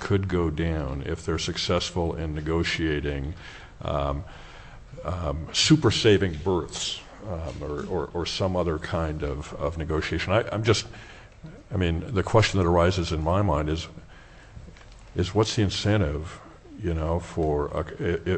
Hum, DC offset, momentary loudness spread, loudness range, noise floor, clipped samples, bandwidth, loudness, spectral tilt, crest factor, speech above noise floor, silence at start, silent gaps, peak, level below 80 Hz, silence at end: none; under 0.1%; 19 LU; 5 LU; -47 dBFS; under 0.1%; 8.6 kHz; -26 LUFS; -5.5 dB/octave; 20 dB; 22 dB; 0 s; none; -6 dBFS; -38 dBFS; 0 s